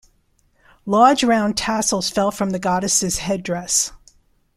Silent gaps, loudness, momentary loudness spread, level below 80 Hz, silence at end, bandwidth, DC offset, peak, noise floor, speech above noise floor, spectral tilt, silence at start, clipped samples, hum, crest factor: none; -18 LUFS; 9 LU; -48 dBFS; 0.6 s; 15.5 kHz; under 0.1%; -2 dBFS; -61 dBFS; 43 dB; -3 dB/octave; 0.85 s; under 0.1%; none; 18 dB